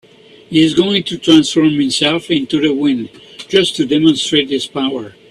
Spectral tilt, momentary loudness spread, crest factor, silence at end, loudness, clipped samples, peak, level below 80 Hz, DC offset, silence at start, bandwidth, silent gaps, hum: -4.5 dB/octave; 9 LU; 14 dB; 0.2 s; -14 LUFS; under 0.1%; 0 dBFS; -52 dBFS; under 0.1%; 0.5 s; 11.5 kHz; none; none